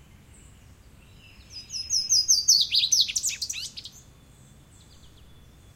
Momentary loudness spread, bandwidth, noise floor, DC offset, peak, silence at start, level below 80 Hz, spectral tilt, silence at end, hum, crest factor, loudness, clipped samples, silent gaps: 24 LU; 16.5 kHz; -52 dBFS; under 0.1%; -8 dBFS; 1.5 s; -56 dBFS; 2.5 dB/octave; 0.7 s; none; 20 dB; -21 LUFS; under 0.1%; none